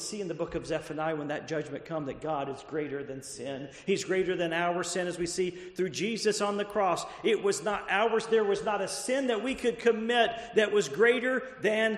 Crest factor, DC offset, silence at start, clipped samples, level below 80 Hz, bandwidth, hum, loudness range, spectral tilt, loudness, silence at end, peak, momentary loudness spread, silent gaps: 18 dB; under 0.1%; 0 s; under 0.1%; -62 dBFS; 13 kHz; none; 7 LU; -4 dB/octave; -30 LUFS; 0 s; -12 dBFS; 9 LU; none